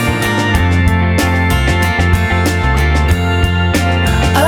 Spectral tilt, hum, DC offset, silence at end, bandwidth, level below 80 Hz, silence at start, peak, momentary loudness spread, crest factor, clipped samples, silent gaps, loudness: -5.5 dB/octave; none; under 0.1%; 0 s; 16.5 kHz; -18 dBFS; 0 s; 0 dBFS; 1 LU; 12 dB; under 0.1%; none; -13 LUFS